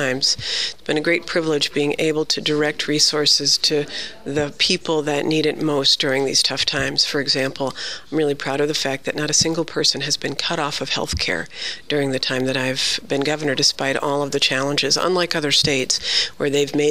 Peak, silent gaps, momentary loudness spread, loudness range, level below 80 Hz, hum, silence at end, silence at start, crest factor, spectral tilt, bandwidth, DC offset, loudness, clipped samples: -4 dBFS; none; 7 LU; 3 LU; -48 dBFS; none; 0 s; 0 s; 18 dB; -2.5 dB/octave; 15.5 kHz; 1%; -19 LUFS; under 0.1%